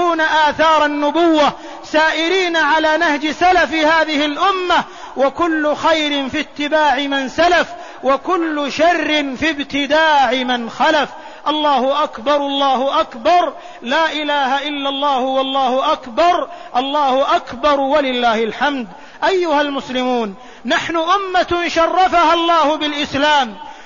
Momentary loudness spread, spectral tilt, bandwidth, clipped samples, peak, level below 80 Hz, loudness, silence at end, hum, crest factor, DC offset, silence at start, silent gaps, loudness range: 7 LU; -3 dB/octave; 7.4 kHz; under 0.1%; -2 dBFS; -48 dBFS; -15 LUFS; 0 s; none; 12 dB; 0.7%; 0 s; none; 2 LU